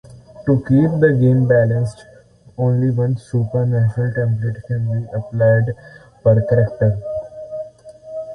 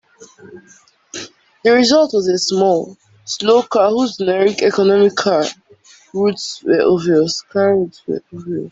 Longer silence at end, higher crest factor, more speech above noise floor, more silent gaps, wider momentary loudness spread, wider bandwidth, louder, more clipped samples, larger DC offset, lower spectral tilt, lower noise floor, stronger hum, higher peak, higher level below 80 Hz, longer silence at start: about the same, 0 s vs 0 s; about the same, 16 dB vs 14 dB; about the same, 30 dB vs 32 dB; neither; about the same, 16 LU vs 15 LU; first, 9.2 kHz vs 8 kHz; about the same, -17 LUFS vs -15 LUFS; neither; neither; first, -10 dB/octave vs -4.5 dB/octave; about the same, -46 dBFS vs -47 dBFS; neither; about the same, -2 dBFS vs -2 dBFS; first, -46 dBFS vs -60 dBFS; about the same, 0.1 s vs 0.2 s